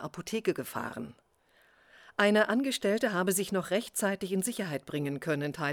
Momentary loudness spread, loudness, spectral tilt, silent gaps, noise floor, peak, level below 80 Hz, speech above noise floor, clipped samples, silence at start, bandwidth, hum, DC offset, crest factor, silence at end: 11 LU; -31 LUFS; -4 dB/octave; none; -66 dBFS; -10 dBFS; -70 dBFS; 35 dB; under 0.1%; 0 s; over 20 kHz; none; under 0.1%; 22 dB; 0 s